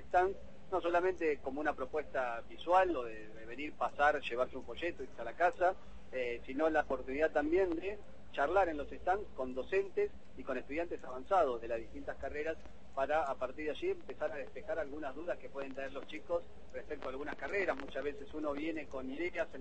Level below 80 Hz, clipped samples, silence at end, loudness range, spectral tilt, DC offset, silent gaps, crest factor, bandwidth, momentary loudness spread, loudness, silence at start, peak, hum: -58 dBFS; under 0.1%; 0 s; 6 LU; -5.5 dB/octave; 0.5%; none; 20 dB; 8.4 kHz; 13 LU; -37 LUFS; 0 s; -16 dBFS; none